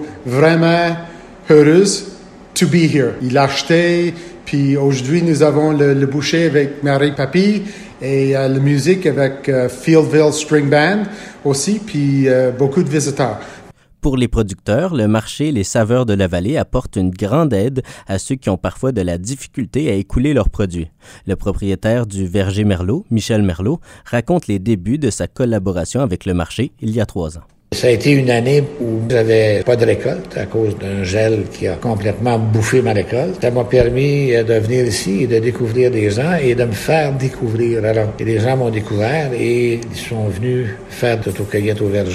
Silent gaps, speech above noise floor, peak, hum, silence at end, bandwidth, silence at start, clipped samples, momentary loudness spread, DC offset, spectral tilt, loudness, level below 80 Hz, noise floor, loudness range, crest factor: none; 24 dB; 0 dBFS; none; 0 s; 15 kHz; 0 s; under 0.1%; 9 LU; under 0.1%; -6 dB/octave; -16 LUFS; -34 dBFS; -38 dBFS; 4 LU; 16 dB